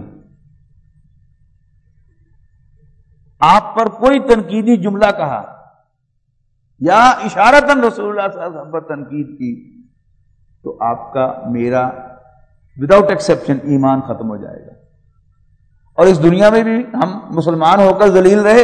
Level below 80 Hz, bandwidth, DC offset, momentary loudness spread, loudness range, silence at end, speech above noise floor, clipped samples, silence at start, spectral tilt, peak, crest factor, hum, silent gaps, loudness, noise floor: -44 dBFS; 12 kHz; under 0.1%; 16 LU; 8 LU; 0 s; 51 dB; 0.6%; 0 s; -6 dB/octave; 0 dBFS; 14 dB; none; none; -13 LUFS; -63 dBFS